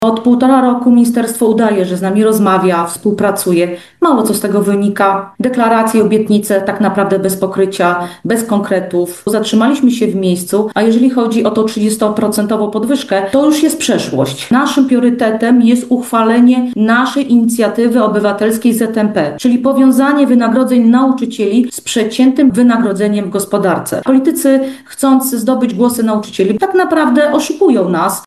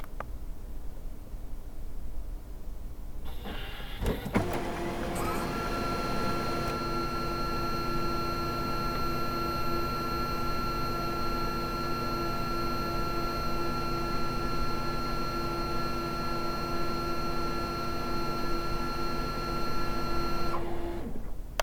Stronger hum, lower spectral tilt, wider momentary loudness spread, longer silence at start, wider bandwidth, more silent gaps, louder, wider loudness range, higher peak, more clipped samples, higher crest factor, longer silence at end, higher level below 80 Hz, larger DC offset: neither; about the same, -5.5 dB/octave vs -5.5 dB/octave; second, 5 LU vs 13 LU; about the same, 0 s vs 0 s; second, 13.5 kHz vs 19 kHz; neither; first, -12 LUFS vs -33 LUFS; second, 2 LU vs 5 LU; first, 0 dBFS vs -8 dBFS; neither; second, 10 dB vs 22 dB; about the same, 0.05 s vs 0 s; second, -56 dBFS vs -38 dBFS; first, 0.1% vs under 0.1%